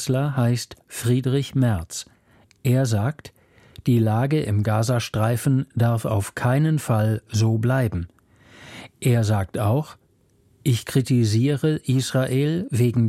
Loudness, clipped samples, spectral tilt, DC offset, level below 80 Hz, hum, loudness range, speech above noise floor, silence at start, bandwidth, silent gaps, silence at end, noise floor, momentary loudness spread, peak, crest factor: -22 LUFS; under 0.1%; -6.5 dB/octave; under 0.1%; -50 dBFS; none; 3 LU; 39 dB; 0 s; 15 kHz; none; 0 s; -60 dBFS; 9 LU; -6 dBFS; 14 dB